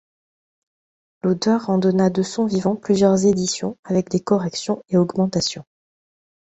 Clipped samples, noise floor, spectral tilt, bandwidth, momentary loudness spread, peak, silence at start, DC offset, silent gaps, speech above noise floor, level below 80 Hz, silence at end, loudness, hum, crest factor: under 0.1%; under -90 dBFS; -6 dB/octave; 8.2 kHz; 8 LU; -4 dBFS; 1.25 s; under 0.1%; 3.79-3.83 s; over 71 dB; -56 dBFS; 0.85 s; -20 LUFS; none; 18 dB